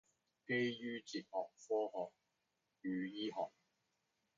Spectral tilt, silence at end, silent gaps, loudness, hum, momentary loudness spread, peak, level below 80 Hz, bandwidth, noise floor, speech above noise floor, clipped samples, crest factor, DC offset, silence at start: -3.5 dB/octave; 0.9 s; none; -43 LUFS; none; 10 LU; -28 dBFS; -90 dBFS; 7.4 kHz; -87 dBFS; 44 dB; under 0.1%; 18 dB; under 0.1%; 0.5 s